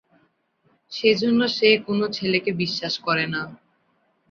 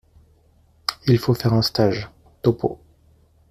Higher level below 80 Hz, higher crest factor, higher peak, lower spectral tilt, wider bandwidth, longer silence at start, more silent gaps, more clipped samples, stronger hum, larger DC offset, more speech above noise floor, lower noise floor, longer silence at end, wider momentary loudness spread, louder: second, -66 dBFS vs -50 dBFS; about the same, 20 dB vs 20 dB; about the same, -4 dBFS vs -2 dBFS; second, -5 dB/octave vs -6.5 dB/octave; second, 7.2 kHz vs 15 kHz; about the same, 0.9 s vs 0.9 s; neither; neither; neither; neither; first, 45 dB vs 38 dB; first, -67 dBFS vs -57 dBFS; about the same, 0.75 s vs 0.75 s; about the same, 9 LU vs 11 LU; about the same, -21 LUFS vs -21 LUFS